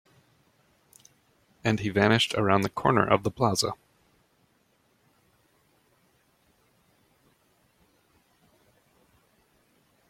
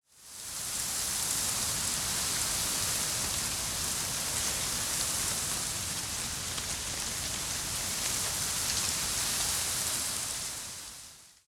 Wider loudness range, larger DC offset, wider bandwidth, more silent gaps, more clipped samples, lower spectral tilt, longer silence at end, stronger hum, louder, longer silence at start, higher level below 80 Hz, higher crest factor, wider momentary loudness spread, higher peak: first, 8 LU vs 2 LU; neither; about the same, 16 kHz vs 17.5 kHz; neither; neither; first, -5 dB/octave vs -0.5 dB/octave; first, 6.35 s vs 0.15 s; neither; first, -25 LUFS vs -30 LUFS; first, 1.65 s vs 0.15 s; second, -62 dBFS vs -52 dBFS; first, 26 dB vs 20 dB; about the same, 8 LU vs 6 LU; first, -6 dBFS vs -14 dBFS